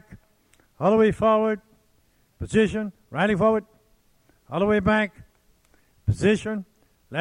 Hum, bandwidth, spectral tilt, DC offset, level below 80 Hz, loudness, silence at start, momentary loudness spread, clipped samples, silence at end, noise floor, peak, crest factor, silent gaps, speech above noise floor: none; 11 kHz; -7 dB/octave; under 0.1%; -48 dBFS; -23 LUFS; 0.1 s; 13 LU; under 0.1%; 0 s; -63 dBFS; -8 dBFS; 18 dB; none; 42 dB